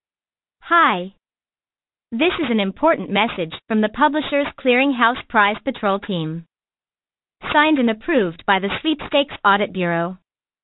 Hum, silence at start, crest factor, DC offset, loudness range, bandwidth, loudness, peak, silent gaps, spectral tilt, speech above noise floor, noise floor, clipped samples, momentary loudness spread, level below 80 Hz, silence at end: none; 0.65 s; 18 dB; under 0.1%; 2 LU; 4.1 kHz; -19 LUFS; -2 dBFS; none; -10 dB/octave; over 71 dB; under -90 dBFS; under 0.1%; 10 LU; -52 dBFS; 0.5 s